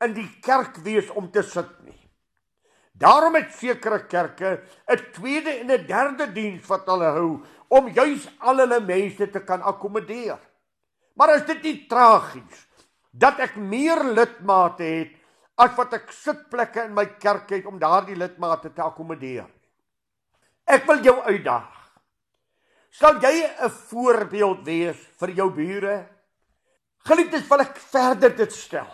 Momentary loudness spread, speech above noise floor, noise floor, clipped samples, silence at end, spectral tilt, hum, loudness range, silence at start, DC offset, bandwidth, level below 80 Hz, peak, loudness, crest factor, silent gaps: 14 LU; 63 dB; -84 dBFS; under 0.1%; 0 s; -5 dB/octave; none; 5 LU; 0 s; under 0.1%; 13.5 kHz; -64 dBFS; -2 dBFS; -21 LUFS; 20 dB; none